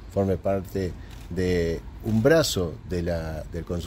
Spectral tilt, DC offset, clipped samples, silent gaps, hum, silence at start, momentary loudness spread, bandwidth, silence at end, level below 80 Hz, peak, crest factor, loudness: -5.5 dB/octave; under 0.1%; under 0.1%; none; none; 0 s; 13 LU; 16 kHz; 0 s; -40 dBFS; -8 dBFS; 18 dB; -26 LUFS